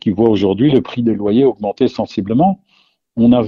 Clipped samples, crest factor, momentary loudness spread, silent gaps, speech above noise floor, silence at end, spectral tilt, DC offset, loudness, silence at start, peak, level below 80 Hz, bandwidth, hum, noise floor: under 0.1%; 14 dB; 6 LU; none; 44 dB; 0 s; -9 dB/octave; under 0.1%; -15 LUFS; 0.05 s; 0 dBFS; -46 dBFS; 6.8 kHz; none; -57 dBFS